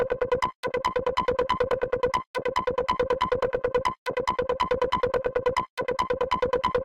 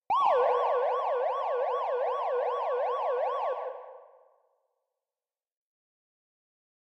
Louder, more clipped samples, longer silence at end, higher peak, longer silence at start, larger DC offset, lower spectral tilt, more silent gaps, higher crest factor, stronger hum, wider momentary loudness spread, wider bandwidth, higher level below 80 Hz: about the same, -27 LUFS vs -29 LUFS; neither; second, 0 s vs 2.8 s; first, -10 dBFS vs -14 dBFS; about the same, 0 s vs 0.1 s; neither; first, -5 dB/octave vs -2.5 dB/octave; first, 0.55-0.63 s, 2.27-2.34 s, 3.98-4.06 s, 5.70-5.77 s vs none; about the same, 16 dB vs 16 dB; neither; second, 3 LU vs 9 LU; first, 12 kHz vs 6 kHz; first, -48 dBFS vs -82 dBFS